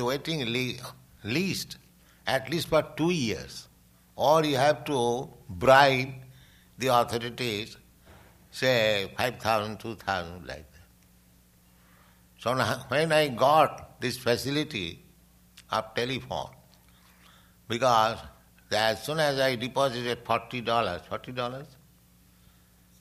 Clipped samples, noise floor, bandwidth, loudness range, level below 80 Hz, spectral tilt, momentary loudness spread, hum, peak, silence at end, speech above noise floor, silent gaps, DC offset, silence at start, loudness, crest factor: under 0.1%; -60 dBFS; 15.5 kHz; 8 LU; -58 dBFS; -4.5 dB/octave; 16 LU; none; -6 dBFS; 1.35 s; 33 dB; none; under 0.1%; 0 s; -27 LUFS; 24 dB